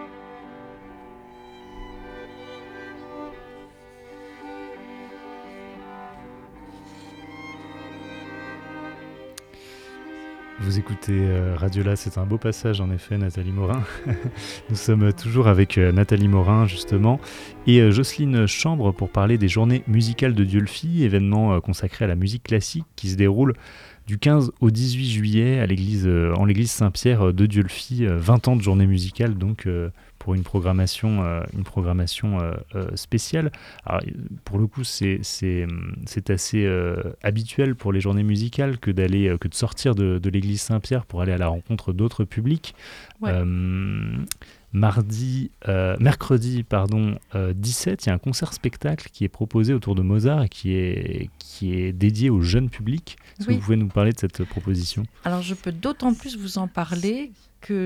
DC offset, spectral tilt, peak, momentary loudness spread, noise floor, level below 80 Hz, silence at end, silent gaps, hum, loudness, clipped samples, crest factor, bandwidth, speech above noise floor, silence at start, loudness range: under 0.1%; -6.5 dB/octave; -4 dBFS; 21 LU; -46 dBFS; -44 dBFS; 0 s; none; none; -22 LUFS; under 0.1%; 18 dB; 14.5 kHz; 25 dB; 0 s; 20 LU